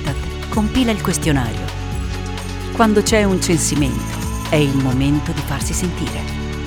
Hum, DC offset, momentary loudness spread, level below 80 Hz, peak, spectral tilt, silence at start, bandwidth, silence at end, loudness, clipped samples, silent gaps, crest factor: none; under 0.1%; 10 LU; -28 dBFS; 0 dBFS; -5 dB/octave; 0 s; 19.5 kHz; 0 s; -18 LUFS; under 0.1%; none; 18 dB